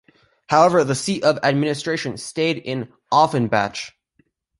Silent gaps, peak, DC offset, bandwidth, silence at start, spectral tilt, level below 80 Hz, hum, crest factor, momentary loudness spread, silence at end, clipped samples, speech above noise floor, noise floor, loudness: none; -2 dBFS; under 0.1%; 11.5 kHz; 0.5 s; -5 dB/octave; -58 dBFS; none; 18 dB; 12 LU; 0.7 s; under 0.1%; 45 dB; -64 dBFS; -20 LUFS